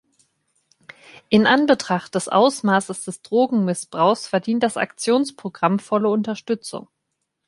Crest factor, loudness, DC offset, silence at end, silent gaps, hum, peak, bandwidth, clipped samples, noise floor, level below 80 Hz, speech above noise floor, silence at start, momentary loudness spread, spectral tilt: 20 dB; -20 LUFS; under 0.1%; 0.65 s; none; none; -2 dBFS; 11.5 kHz; under 0.1%; -76 dBFS; -64 dBFS; 57 dB; 1.3 s; 10 LU; -5 dB/octave